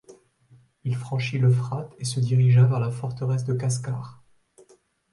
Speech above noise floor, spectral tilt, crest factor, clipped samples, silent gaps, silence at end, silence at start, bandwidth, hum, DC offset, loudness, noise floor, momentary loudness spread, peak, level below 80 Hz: 37 dB; -6.5 dB/octave; 16 dB; under 0.1%; none; 1 s; 0.1 s; 11.5 kHz; none; under 0.1%; -24 LUFS; -59 dBFS; 14 LU; -8 dBFS; -60 dBFS